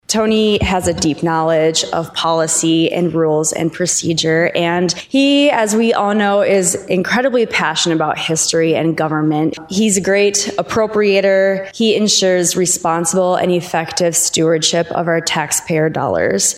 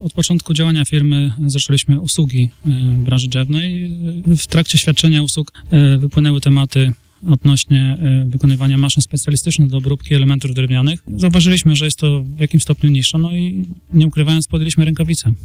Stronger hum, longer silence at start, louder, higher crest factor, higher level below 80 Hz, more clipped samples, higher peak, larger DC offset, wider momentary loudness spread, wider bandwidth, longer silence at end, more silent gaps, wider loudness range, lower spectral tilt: neither; about the same, 0.1 s vs 0 s; about the same, -14 LUFS vs -14 LUFS; about the same, 14 dB vs 12 dB; second, -44 dBFS vs -36 dBFS; neither; about the same, 0 dBFS vs -2 dBFS; neither; about the same, 5 LU vs 6 LU; about the same, 16 kHz vs 15.5 kHz; about the same, 0 s vs 0 s; neither; about the same, 1 LU vs 2 LU; second, -3.5 dB/octave vs -5.5 dB/octave